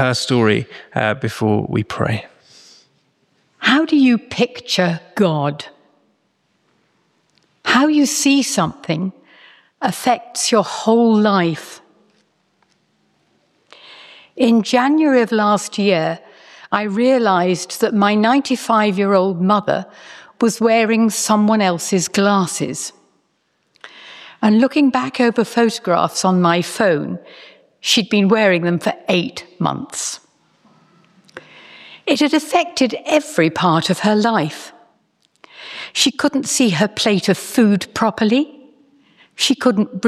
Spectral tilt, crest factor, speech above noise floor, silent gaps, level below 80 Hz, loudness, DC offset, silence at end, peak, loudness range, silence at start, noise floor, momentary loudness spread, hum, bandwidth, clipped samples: -4.5 dB/octave; 16 dB; 49 dB; none; -62 dBFS; -16 LUFS; under 0.1%; 0 s; -2 dBFS; 5 LU; 0 s; -65 dBFS; 10 LU; none; 14.5 kHz; under 0.1%